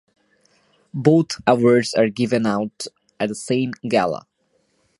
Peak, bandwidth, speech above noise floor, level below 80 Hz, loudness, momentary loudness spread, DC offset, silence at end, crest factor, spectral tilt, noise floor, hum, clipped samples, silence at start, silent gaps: 0 dBFS; 11.5 kHz; 47 dB; -60 dBFS; -19 LUFS; 14 LU; under 0.1%; 0.85 s; 20 dB; -6 dB/octave; -66 dBFS; none; under 0.1%; 0.95 s; none